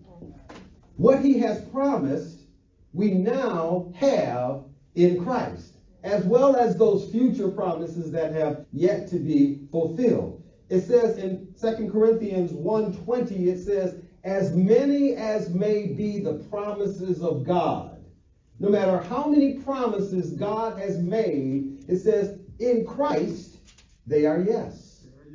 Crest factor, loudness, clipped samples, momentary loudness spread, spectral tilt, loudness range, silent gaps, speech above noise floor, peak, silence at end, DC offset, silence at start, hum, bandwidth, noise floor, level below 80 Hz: 20 dB; -24 LUFS; under 0.1%; 11 LU; -8 dB/octave; 3 LU; none; 34 dB; -4 dBFS; 0 s; under 0.1%; 0.15 s; none; 7.6 kHz; -57 dBFS; -56 dBFS